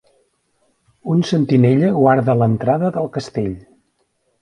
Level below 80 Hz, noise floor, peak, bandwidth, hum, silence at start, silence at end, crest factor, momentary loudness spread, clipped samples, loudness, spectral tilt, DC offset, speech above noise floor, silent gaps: -52 dBFS; -66 dBFS; 0 dBFS; 10.5 kHz; none; 1.05 s; 0.85 s; 18 dB; 11 LU; under 0.1%; -16 LUFS; -8 dB/octave; under 0.1%; 50 dB; none